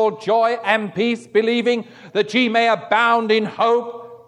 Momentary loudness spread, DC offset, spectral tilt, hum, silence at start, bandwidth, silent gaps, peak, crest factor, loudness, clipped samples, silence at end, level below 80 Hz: 6 LU; under 0.1%; -5 dB/octave; none; 0 s; 10.5 kHz; none; -2 dBFS; 16 dB; -18 LUFS; under 0.1%; 0.1 s; -74 dBFS